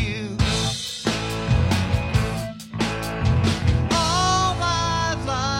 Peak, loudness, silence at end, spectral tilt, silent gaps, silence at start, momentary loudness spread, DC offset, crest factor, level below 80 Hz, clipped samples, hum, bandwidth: -6 dBFS; -22 LUFS; 0 s; -4.5 dB/octave; none; 0 s; 7 LU; under 0.1%; 14 dB; -32 dBFS; under 0.1%; none; 16.5 kHz